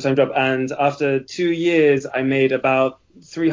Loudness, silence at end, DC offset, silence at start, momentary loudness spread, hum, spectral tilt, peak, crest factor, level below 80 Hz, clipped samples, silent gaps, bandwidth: -19 LUFS; 0 s; under 0.1%; 0 s; 6 LU; none; -6 dB/octave; -4 dBFS; 16 dB; -62 dBFS; under 0.1%; none; 7.6 kHz